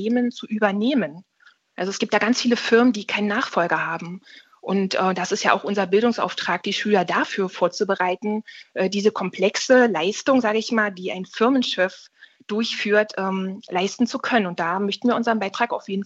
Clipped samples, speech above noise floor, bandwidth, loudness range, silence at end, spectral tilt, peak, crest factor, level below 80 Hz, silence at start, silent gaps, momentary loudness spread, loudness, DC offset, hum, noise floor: under 0.1%; 35 dB; 8 kHz; 2 LU; 0 s; -4.5 dB/octave; -2 dBFS; 18 dB; -76 dBFS; 0 s; none; 8 LU; -22 LUFS; under 0.1%; none; -57 dBFS